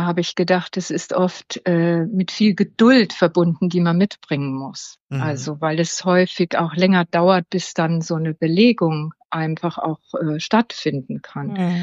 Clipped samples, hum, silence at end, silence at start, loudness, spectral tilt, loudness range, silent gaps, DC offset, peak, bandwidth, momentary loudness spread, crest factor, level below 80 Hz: under 0.1%; none; 0 s; 0 s; -19 LUFS; -6 dB/octave; 3 LU; 5.00-5.09 s, 9.25-9.29 s; under 0.1%; -2 dBFS; 7.8 kHz; 11 LU; 16 dB; -68 dBFS